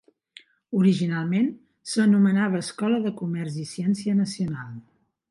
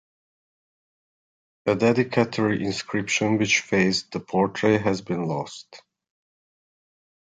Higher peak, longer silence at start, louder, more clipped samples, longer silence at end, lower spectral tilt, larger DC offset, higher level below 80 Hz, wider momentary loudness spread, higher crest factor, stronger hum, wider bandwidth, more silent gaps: second, -10 dBFS vs -6 dBFS; second, 0.7 s vs 1.65 s; about the same, -24 LUFS vs -23 LUFS; neither; second, 0.5 s vs 1.45 s; first, -6.5 dB/octave vs -5 dB/octave; neither; second, -66 dBFS vs -60 dBFS; first, 12 LU vs 8 LU; second, 14 dB vs 20 dB; neither; first, 11.5 kHz vs 9.6 kHz; neither